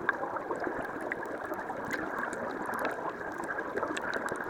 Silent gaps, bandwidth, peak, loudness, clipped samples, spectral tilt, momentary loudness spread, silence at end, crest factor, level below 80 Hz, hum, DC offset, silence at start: none; 19 kHz; -12 dBFS; -35 LUFS; under 0.1%; -4.5 dB/octave; 3 LU; 0 s; 24 dB; -64 dBFS; none; under 0.1%; 0 s